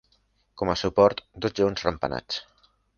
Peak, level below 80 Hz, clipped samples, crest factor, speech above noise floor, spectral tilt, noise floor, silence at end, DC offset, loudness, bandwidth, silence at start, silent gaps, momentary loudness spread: -4 dBFS; -50 dBFS; under 0.1%; 22 dB; 43 dB; -5.5 dB/octave; -67 dBFS; 0.55 s; under 0.1%; -25 LUFS; 7 kHz; 0.55 s; none; 11 LU